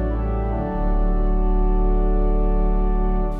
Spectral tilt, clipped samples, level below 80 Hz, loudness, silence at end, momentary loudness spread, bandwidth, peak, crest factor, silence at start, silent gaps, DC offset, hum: -11 dB/octave; under 0.1%; -18 dBFS; -23 LUFS; 0 s; 2 LU; 2.9 kHz; -10 dBFS; 8 dB; 0 s; none; under 0.1%; none